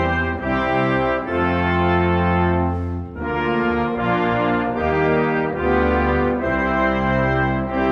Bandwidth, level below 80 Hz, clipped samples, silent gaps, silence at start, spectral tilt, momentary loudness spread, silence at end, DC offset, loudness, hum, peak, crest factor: 6.6 kHz; -34 dBFS; under 0.1%; none; 0 s; -8.5 dB/octave; 3 LU; 0 s; under 0.1%; -19 LUFS; none; -4 dBFS; 14 dB